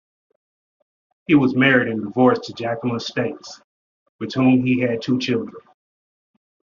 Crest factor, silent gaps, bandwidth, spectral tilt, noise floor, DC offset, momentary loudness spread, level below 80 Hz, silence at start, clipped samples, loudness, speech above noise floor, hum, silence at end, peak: 20 dB; 3.64-4.19 s; 7.4 kHz; -5 dB/octave; under -90 dBFS; under 0.1%; 17 LU; -62 dBFS; 1.3 s; under 0.1%; -19 LUFS; over 71 dB; none; 1.15 s; -2 dBFS